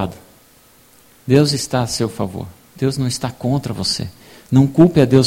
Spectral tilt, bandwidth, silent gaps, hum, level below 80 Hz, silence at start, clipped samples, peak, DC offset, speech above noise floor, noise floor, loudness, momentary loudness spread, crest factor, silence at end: -6 dB/octave; 16.5 kHz; none; none; -44 dBFS; 0 s; under 0.1%; 0 dBFS; under 0.1%; 34 dB; -50 dBFS; -17 LUFS; 15 LU; 18 dB; 0 s